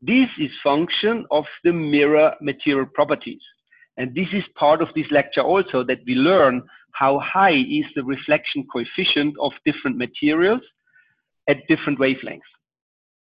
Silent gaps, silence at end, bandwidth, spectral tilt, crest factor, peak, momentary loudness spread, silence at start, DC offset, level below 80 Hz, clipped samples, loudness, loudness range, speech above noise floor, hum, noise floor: none; 0.85 s; 5.4 kHz; -8.5 dB/octave; 16 dB; -4 dBFS; 10 LU; 0 s; under 0.1%; -60 dBFS; under 0.1%; -20 LUFS; 3 LU; 42 dB; none; -62 dBFS